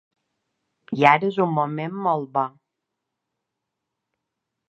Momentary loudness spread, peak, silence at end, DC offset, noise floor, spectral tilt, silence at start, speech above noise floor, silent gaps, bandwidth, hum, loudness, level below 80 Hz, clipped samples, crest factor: 11 LU; 0 dBFS; 2.2 s; under 0.1%; -82 dBFS; -7.5 dB/octave; 0.9 s; 61 dB; none; 8.4 kHz; none; -21 LUFS; -76 dBFS; under 0.1%; 24 dB